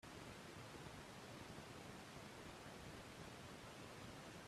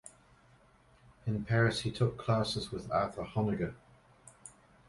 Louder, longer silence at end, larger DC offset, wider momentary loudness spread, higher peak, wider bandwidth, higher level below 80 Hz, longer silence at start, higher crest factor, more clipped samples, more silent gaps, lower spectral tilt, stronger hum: second, -56 LUFS vs -33 LUFS; second, 0 s vs 0.4 s; neither; second, 1 LU vs 23 LU; second, -40 dBFS vs -16 dBFS; first, 15 kHz vs 11.5 kHz; second, -72 dBFS vs -58 dBFS; about the same, 0.05 s vs 0.05 s; about the same, 16 dB vs 20 dB; neither; neither; second, -4 dB/octave vs -6 dB/octave; neither